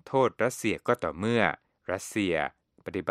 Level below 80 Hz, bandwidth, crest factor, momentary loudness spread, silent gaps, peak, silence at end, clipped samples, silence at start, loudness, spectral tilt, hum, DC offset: -62 dBFS; 15.5 kHz; 22 dB; 10 LU; none; -6 dBFS; 0 s; under 0.1%; 0.05 s; -29 LUFS; -5 dB/octave; none; under 0.1%